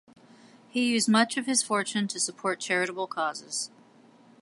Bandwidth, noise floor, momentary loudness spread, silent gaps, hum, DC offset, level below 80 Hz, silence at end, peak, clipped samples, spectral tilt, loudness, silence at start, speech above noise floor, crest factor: 11.5 kHz; -56 dBFS; 10 LU; none; none; under 0.1%; -82 dBFS; 0.75 s; -8 dBFS; under 0.1%; -2.5 dB/octave; -27 LUFS; 0.75 s; 29 dB; 22 dB